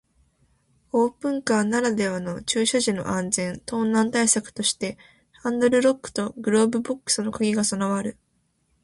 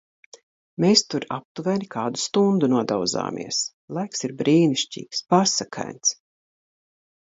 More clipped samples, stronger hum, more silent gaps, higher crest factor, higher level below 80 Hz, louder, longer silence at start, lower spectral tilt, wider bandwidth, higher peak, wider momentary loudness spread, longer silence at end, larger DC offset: neither; neither; second, none vs 1.45-1.55 s, 3.73-3.88 s; about the same, 18 dB vs 20 dB; first, -60 dBFS vs -68 dBFS; about the same, -23 LUFS vs -22 LUFS; first, 0.95 s vs 0.8 s; about the same, -3.5 dB/octave vs -4 dB/octave; first, 11.5 kHz vs 8 kHz; about the same, -6 dBFS vs -4 dBFS; second, 8 LU vs 11 LU; second, 0.7 s vs 1.15 s; neither